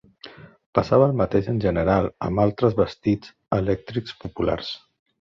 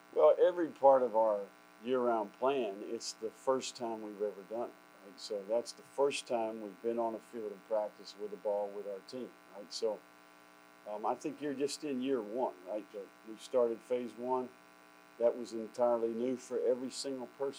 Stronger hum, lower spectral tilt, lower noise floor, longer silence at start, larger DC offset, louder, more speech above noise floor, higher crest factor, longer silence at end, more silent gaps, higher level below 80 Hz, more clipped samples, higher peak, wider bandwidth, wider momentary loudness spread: neither; first, -8.5 dB/octave vs -4 dB/octave; second, -45 dBFS vs -60 dBFS; about the same, 0.25 s vs 0.15 s; neither; first, -23 LUFS vs -35 LUFS; about the same, 23 dB vs 25 dB; about the same, 18 dB vs 22 dB; first, 0.45 s vs 0 s; first, 0.66-0.73 s vs none; first, -42 dBFS vs under -90 dBFS; neither; first, -4 dBFS vs -14 dBFS; second, 7.2 kHz vs over 20 kHz; second, 13 LU vs 16 LU